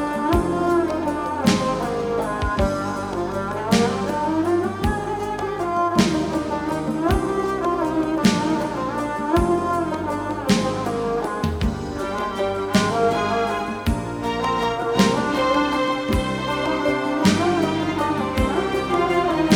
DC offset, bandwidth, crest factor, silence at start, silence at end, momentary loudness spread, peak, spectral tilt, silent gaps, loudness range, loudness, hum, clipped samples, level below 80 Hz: under 0.1%; 19 kHz; 18 dB; 0 s; 0 s; 6 LU; -2 dBFS; -5.5 dB/octave; none; 2 LU; -22 LUFS; none; under 0.1%; -36 dBFS